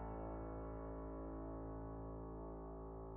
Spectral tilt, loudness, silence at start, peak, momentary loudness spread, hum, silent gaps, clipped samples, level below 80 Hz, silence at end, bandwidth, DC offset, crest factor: -7 dB/octave; -50 LUFS; 0 s; -38 dBFS; 3 LU; none; none; under 0.1%; -54 dBFS; 0 s; 2.8 kHz; under 0.1%; 10 dB